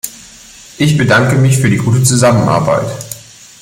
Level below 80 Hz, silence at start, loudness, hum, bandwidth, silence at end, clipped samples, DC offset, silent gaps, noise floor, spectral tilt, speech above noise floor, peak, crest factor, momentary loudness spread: -42 dBFS; 0.05 s; -11 LUFS; none; 16.5 kHz; 0.4 s; under 0.1%; under 0.1%; none; -37 dBFS; -5.5 dB/octave; 27 dB; 0 dBFS; 12 dB; 16 LU